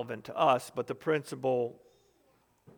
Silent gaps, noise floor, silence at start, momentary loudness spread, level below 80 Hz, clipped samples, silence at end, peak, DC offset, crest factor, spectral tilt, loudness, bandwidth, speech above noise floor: none; -69 dBFS; 0 s; 11 LU; -78 dBFS; under 0.1%; 1.05 s; -12 dBFS; under 0.1%; 20 dB; -5.5 dB/octave; -31 LUFS; over 20 kHz; 38 dB